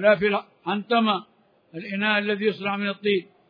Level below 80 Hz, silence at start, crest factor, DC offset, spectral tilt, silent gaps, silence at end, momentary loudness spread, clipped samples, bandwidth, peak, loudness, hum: -68 dBFS; 0 s; 18 dB; under 0.1%; -8 dB/octave; none; 0.25 s; 8 LU; under 0.1%; 5.2 kHz; -6 dBFS; -24 LUFS; none